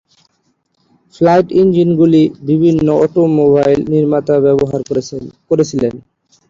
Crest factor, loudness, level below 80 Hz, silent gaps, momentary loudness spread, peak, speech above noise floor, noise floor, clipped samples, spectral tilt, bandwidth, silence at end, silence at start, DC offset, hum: 12 dB; -12 LUFS; -46 dBFS; none; 8 LU; -2 dBFS; 51 dB; -62 dBFS; under 0.1%; -8 dB/octave; 7.6 kHz; 0.5 s; 1.2 s; under 0.1%; none